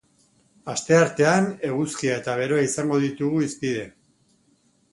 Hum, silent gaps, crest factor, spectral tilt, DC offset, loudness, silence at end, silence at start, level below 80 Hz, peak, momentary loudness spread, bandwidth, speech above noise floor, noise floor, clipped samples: none; none; 20 dB; -5 dB/octave; under 0.1%; -23 LUFS; 1.05 s; 0.65 s; -64 dBFS; -4 dBFS; 12 LU; 11.5 kHz; 41 dB; -63 dBFS; under 0.1%